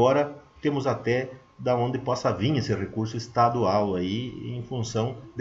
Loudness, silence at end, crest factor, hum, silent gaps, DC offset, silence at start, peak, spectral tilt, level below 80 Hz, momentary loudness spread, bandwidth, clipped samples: -27 LUFS; 0 s; 18 dB; none; none; under 0.1%; 0 s; -8 dBFS; -6.5 dB/octave; -56 dBFS; 9 LU; 7.8 kHz; under 0.1%